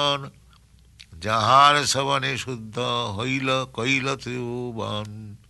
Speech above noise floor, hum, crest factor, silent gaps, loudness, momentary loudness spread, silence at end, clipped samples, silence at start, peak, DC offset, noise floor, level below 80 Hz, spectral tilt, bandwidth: 30 dB; none; 20 dB; none; -22 LUFS; 16 LU; 0.15 s; under 0.1%; 0 s; -4 dBFS; under 0.1%; -53 dBFS; -56 dBFS; -3.5 dB/octave; 12 kHz